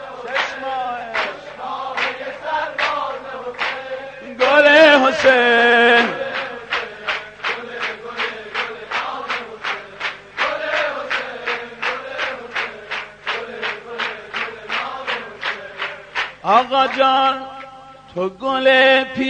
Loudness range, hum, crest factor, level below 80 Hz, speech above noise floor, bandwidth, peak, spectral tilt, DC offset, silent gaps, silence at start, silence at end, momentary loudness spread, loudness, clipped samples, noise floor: 11 LU; 50 Hz at -55 dBFS; 18 dB; -58 dBFS; 25 dB; 9.2 kHz; -2 dBFS; -3 dB/octave; under 0.1%; none; 0 s; 0 s; 15 LU; -18 LUFS; under 0.1%; -40 dBFS